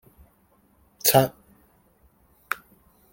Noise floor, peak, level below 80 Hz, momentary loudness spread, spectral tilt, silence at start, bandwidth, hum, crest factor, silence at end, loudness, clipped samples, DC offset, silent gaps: -62 dBFS; -2 dBFS; -60 dBFS; 15 LU; -3.5 dB/octave; 1.05 s; 17 kHz; none; 26 dB; 0.6 s; -23 LUFS; under 0.1%; under 0.1%; none